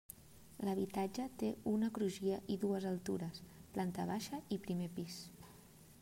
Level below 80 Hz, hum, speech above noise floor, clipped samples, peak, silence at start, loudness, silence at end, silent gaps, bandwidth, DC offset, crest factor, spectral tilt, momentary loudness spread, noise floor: -70 dBFS; none; 21 dB; under 0.1%; -26 dBFS; 0.1 s; -41 LUFS; 0 s; none; 16 kHz; under 0.1%; 14 dB; -6 dB/octave; 18 LU; -61 dBFS